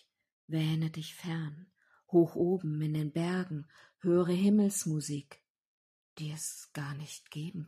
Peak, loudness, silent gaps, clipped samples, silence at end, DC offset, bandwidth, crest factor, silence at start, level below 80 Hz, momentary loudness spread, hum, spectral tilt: -14 dBFS; -33 LUFS; 5.50-6.16 s; under 0.1%; 0 s; under 0.1%; 14.5 kHz; 20 dB; 0.5 s; -76 dBFS; 15 LU; none; -6 dB/octave